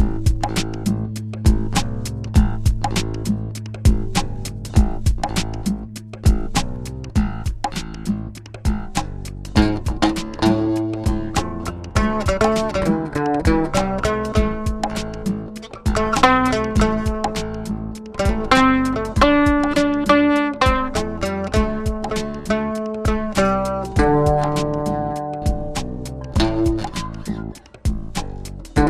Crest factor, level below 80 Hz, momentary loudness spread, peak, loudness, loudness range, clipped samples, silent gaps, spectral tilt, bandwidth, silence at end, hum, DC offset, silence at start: 20 dB; -26 dBFS; 12 LU; 0 dBFS; -21 LUFS; 6 LU; under 0.1%; none; -6 dB/octave; 14 kHz; 0 s; none; under 0.1%; 0 s